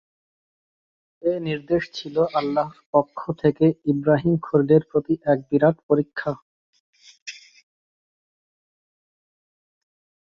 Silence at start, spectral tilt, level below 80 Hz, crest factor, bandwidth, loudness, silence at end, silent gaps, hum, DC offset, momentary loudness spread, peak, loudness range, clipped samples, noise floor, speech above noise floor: 1.25 s; -8 dB/octave; -60 dBFS; 20 dB; 7.4 kHz; -22 LUFS; 2.9 s; 2.86-2.93 s, 5.83-5.89 s, 6.42-6.73 s, 6.80-6.93 s, 7.22-7.26 s; none; under 0.1%; 11 LU; -4 dBFS; 9 LU; under 0.1%; under -90 dBFS; over 69 dB